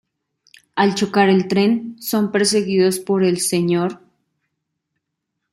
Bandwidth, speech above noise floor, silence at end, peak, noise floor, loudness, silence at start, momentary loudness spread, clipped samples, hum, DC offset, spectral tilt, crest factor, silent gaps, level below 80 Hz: 16 kHz; 61 dB; 1.55 s; -2 dBFS; -78 dBFS; -18 LUFS; 0.75 s; 7 LU; under 0.1%; none; under 0.1%; -4.5 dB/octave; 16 dB; none; -64 dBFS